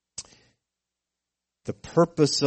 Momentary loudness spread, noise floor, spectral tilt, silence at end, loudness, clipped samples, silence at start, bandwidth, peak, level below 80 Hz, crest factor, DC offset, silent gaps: 19 LU; -87 dBFS; -5 dB/octave; 0 s; -23 LUFS; under 0.1%; 0.2 s; 8.8 kHz; -8 dBFS; -60 dBFS; 20 dB; under 0.1%; none